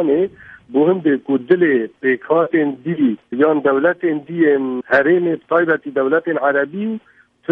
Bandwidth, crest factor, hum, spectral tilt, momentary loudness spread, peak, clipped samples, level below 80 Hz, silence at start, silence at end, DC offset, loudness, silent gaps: 5 kHz; 16 dB; none; -9 dB/octave; 6 LU; -2 dBFS; under 0.1%; -64 dBFS; 0 s; 0 s; under 0.1%; -17 LUFS; none